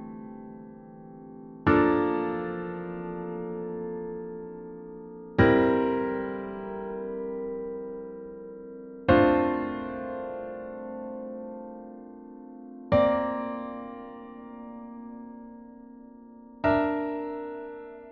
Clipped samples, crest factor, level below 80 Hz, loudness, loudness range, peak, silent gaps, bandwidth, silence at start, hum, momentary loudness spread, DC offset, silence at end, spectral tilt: under 0.1%; 22 dB; -52 dBFS; -28 LUFS; 7 LU; -6 dBFS; none; 5.6 kHz; 0 s; none; 23 LU; under 0.1%; 0 s; -6 dB/octave